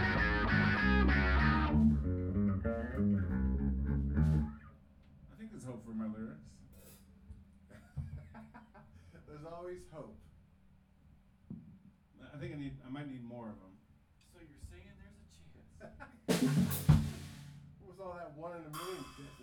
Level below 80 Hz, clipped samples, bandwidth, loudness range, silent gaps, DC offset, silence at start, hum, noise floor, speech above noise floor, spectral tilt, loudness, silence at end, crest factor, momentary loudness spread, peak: -42 dBFS; under 0.1%; over 20 kHz; 21 LU; none; under 0.1%; 0 s; none; -66 dBFS; 19 dB; -6.5 dB/octave; -34 LUFS; 0 s; 22 dB; 25 LU; -14 dBFS